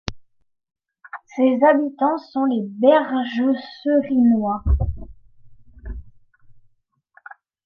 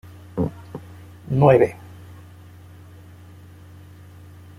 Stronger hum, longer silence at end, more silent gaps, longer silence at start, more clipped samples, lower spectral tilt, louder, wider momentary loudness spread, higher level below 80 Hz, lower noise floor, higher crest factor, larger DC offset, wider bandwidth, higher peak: neither; second, 0.35 s vs 2.85 s; neither; second, 0.1 s vs 0.35 s; neither; about the same, -8 dB/octave vs -9 dB/octave; about the same, -19 LUFS vs -20 LUFS; second, 22 LU vs 29 LU; first, -32 dBFS vs -52 dBFS; first, -65 dBFS vs -44 dBFS; about the same, 18 dB vs 22 dB; neither; second, 6.8 kHz vs 14 kHz; about the same, -2 dBFS vs -2 dBFS